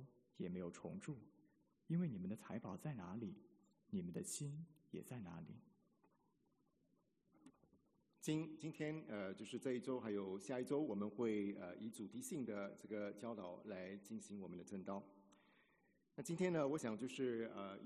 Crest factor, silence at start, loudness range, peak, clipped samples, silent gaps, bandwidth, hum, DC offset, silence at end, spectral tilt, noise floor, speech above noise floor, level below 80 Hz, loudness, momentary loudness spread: 20 dB; 0 s; 8 LU; -28 dBFS; under 0.1%; none; 12 kHz; none; under 0.1%; 0 s; -6 dB/octave; -82 dBFS; 35 dB; -86 dBFS; -48 LUFS; 11 LU